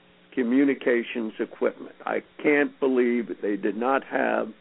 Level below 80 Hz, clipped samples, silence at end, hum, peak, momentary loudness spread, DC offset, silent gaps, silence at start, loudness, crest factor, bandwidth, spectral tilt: -74 dBFS; under 0.1%; 0.1 s; none; -8 dBFS; 9 LU; under 0.1%; none; 0.35 s; -25 LUFS; 16 dB; 4.1 kHz; -9.5 dB/octave